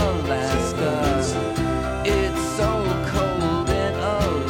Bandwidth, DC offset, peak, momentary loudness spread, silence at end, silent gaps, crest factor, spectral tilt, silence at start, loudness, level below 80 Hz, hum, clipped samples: 18 kHz; under 0.1%; -8 dBFS; 2 LU; 0 s; none; 14 dB; -5.5 dB/octave; 0 s; -22 LUFS; -32 dBFS; none; under 0.1%